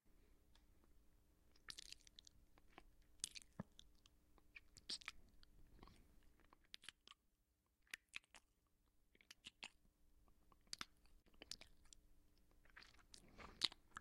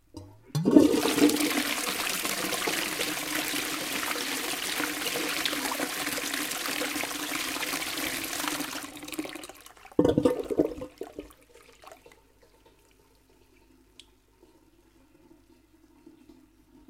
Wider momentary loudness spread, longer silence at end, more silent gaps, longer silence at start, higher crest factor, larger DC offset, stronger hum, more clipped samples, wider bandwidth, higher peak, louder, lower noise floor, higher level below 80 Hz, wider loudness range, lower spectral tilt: first, 18 LU vs 14 LU; second, 0 s vs 0.55 s; neither; about the same, 0.05 s vs 0.15 s; first, 40 dB vs 28 dB; neither; neither; neither; about the same, 16 kHz vs 16.5 kHz; second, -20 dBFS vs -2 dBFS; second, -54 LUFS vs -28 LUFS; first, -85 dBFS vs -61 dBFS; second, -74 dBFS vs -60 dBFS; about the same, 6 LU vs 6 LU; second, -1 dB/octave vs -3 dB/octave